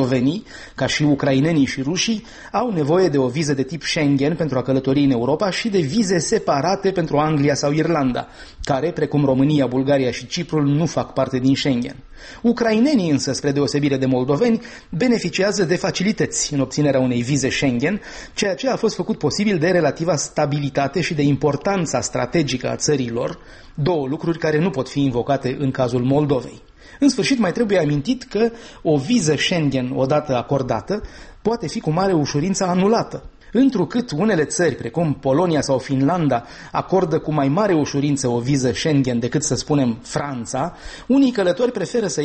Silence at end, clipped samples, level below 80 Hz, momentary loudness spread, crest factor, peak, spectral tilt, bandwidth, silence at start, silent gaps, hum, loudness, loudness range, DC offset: 0 s; under 0.1%; -46 dBFS; 7 LU; 14 dB; -6 dBFS; -5.5 dB/octave; 8.8 kHz; 0 s; none; none; -19 LUFS; 2 LU; under 0.1%